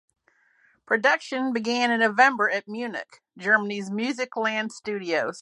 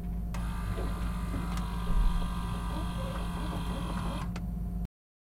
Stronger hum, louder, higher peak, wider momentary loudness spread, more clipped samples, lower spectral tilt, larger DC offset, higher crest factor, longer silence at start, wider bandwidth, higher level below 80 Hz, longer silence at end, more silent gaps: neither; first, -24 LUFS vs -35 LUFS; first, -4 dBFS vs -16 dBFS; first, 13 LU vs 4 LU; neither; second, -4 dB/octave vs -6.5 dB/octave; neither; first, 22 dB vs 16 dB; first, 0.9 s vs 0 s; second, 11 kHz vs 15.5 kHz; second, -80 dBFS vs -34 dBFS; second, 0 s vs 0.35 s; neither